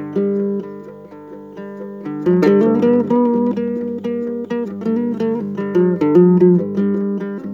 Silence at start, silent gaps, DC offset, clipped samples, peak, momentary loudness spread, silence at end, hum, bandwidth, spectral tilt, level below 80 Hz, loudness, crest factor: 0 s; none; under 0.1%; under 0.1%; -2 dBFS; 20 LU; 0 s; 50 Hz at -30 dBFS; 7 kHz; -10 dB/octave; -64 dBFS; -16 LUFS; 16 dB